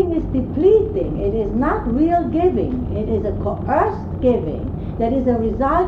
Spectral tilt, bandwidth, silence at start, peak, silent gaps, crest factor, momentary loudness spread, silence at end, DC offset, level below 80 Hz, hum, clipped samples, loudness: -10 dB/octave; 5.4 kHz; 0 s; -4 dBFS; none; 14 dB; 7 LU; 0 s; under 0.1%; -30 dBFS; none; under 0.1%; -19 LUFS